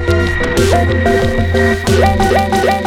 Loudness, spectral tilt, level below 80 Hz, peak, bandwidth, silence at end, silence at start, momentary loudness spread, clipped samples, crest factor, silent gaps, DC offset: -12 LUFS; -5.5 dB/octave; -22 dBFS; 0 dBFS; 16 kHz; 0 s; 0 s; 3 LU; under 0.1%; 10 dB; none; under 0.1%